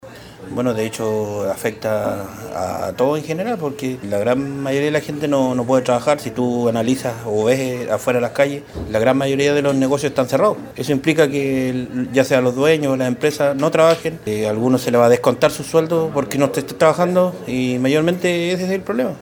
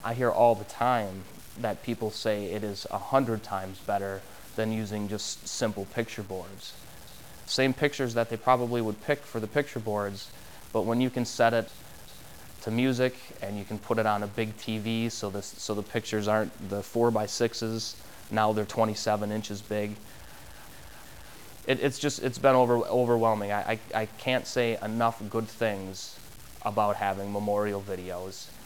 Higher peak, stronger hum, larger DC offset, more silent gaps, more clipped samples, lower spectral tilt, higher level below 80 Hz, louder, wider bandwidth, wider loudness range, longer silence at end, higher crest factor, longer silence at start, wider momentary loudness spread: first, 0 dBFS vs -8 dBFS; neither; second, under 0.1% vs 0.4%; neither; neither; about the same, -5.5 dB/octave vs -5 dB/octave; first, -50 dBFS vs -58 dBFS; first, -18 LUFS vs -29 LUFS; first, over 20 kHz vs 16 kHz; about the same, 5 LU vs 5 LU; about the same, 0 s vs 0 s; about the same, 18 dB vs 22 dB; about the same, 0.05 s vs 0 s; second, 7 LU vs 19 LU